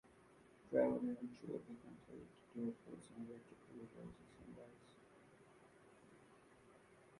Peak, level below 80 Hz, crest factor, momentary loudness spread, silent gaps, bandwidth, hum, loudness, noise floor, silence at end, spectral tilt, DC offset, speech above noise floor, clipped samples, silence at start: -24 dBFS; -78 dBFS; 26 dB; 26 LU; none; 11.5 kHz; none; -46 LUFS; -68 dBFS; 0 s; -7.5 dB/octave; under 0.1%; 21 dB; under 0.1%; 0.05 s